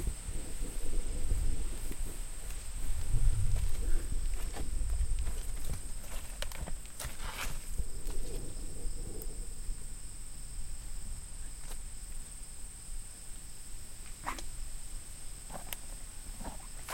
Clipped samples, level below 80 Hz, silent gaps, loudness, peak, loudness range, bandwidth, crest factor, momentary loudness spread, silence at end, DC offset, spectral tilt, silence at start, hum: under 0.1%; -36 dBFS; none; -42 LUFS; -14 dBFS; 8 LU; 16.5 kHz; 18 dB; 9 LU; 0 s; under 0.1%; -3.5 dB/octave; 0 s; none